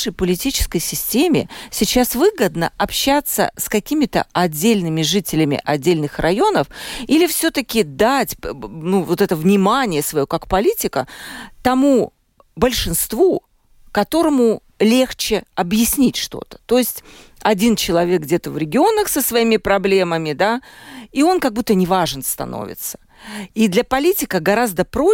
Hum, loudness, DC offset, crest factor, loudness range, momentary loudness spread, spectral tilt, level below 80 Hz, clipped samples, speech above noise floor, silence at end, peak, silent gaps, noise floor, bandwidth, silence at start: none; -17 LUFS; under 0.1%; 16 dB; 2 LU; 10 LU; -4.5 dB/octave; -38 dBFS; under 0.1%; 31 dB; 0 s; -2 dBFS; none; -48 dBFS; 17 kHz; 0 s